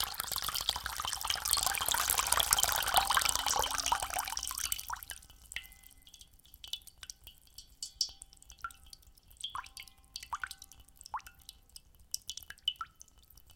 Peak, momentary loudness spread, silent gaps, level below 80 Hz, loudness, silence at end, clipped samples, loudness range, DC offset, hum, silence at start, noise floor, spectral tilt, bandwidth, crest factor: 0 dBFS; 24 LU; none; -56 dBFS; -33 LUFS; 0.05 s; under 0.1%; 16 LU; under 0.1%; none; 0 s; -60 dBFS; 1 dB/octave; 17 kHz; 38 dB